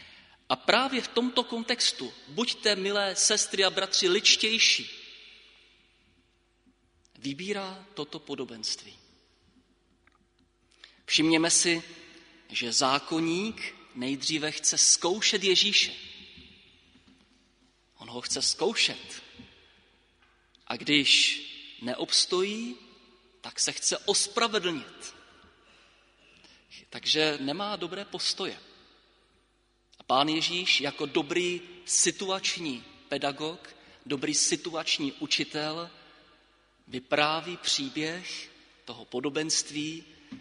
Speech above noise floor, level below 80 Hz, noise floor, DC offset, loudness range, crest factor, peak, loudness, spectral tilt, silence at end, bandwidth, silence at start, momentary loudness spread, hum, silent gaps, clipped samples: 41 dB; -70 dBFS; -69 dBFS; under 0.1%; 8 LU; 26 dB; -4 dBFS; -26 LUFS; -1.5 dB/octave; 0 s; 11 kHz; 0 s; 19 LU; none; none; under 0.1%